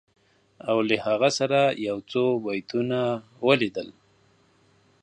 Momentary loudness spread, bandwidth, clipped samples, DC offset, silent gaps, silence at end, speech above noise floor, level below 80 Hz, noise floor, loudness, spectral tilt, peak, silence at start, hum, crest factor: 8 LU; 10 kHz; under 0.1%; under 0.1%; none; 1.1 s; 37 dB; -70 dBFS; -62 dBFS; -24 LUFS; -5 dB/octave; -4 dBFS; 0.65 s; none; 22 dB